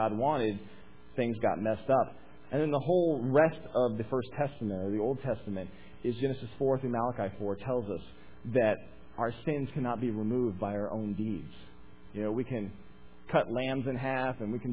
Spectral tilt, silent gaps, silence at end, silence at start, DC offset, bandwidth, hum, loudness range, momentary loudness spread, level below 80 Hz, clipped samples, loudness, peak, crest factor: -6.5 dB/octave; none; 0 s; 0 s; 0.4%; 4 kHz; none; 5 LU; 10 LU; -58 dBFS; under 0.1%; -32 LUFS; -12 dBFS; 20 dB